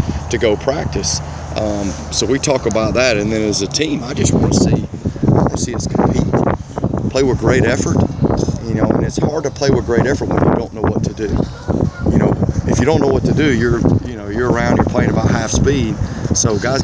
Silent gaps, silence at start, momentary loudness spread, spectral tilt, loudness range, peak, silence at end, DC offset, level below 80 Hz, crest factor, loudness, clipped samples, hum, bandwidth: none; 0 s; 6 LU; -5.5 dB/octave; 2 LU; 0 dBFS; 0 s; under 0.1%; -28 dBFS; 16 dB; -16 LUFS; under 0.1%; none; 8 kHz